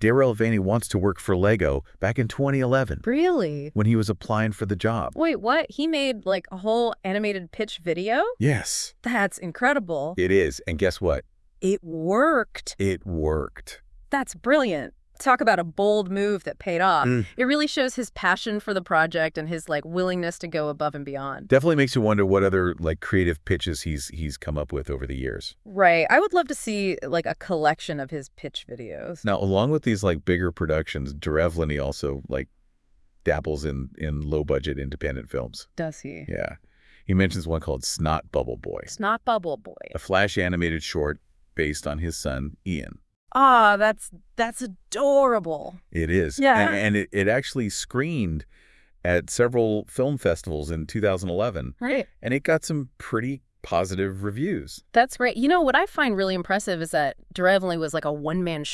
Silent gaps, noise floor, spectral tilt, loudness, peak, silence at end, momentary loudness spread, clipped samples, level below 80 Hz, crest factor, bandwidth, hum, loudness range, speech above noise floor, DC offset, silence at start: 43.16-43.27 s; -60 dBFS; -5.5 dB/octave; -24 LUFS; -4 dBFS; 0 s; 12 LU; under 0.1%; -44 dBFS; 22 dB; 12 kHz; none; 5 LU; 36 dB; under 0.1%; 0 s